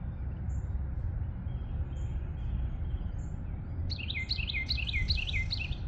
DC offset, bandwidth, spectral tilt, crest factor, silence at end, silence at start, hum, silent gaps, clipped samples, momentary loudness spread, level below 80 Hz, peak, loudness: under 0.1%; 7.8 kHz; -5.5 dB/octave; 16 dB; 0 s; 0 s; none; none; under 0.1%; 8 LU; -36 dBFS; -18 dBFS; -35 LUFS